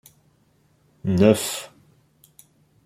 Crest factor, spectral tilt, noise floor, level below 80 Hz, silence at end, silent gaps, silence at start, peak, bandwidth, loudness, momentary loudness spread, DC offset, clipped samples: 22 dB; -5.5 dB/octave; -62 dBFS; -58 dBFS; 1.2 s; none; 1.05 s; -2 dBFS; 16 kHz; -21 LUFS; 16 LU; under 0.1%; under 0.1%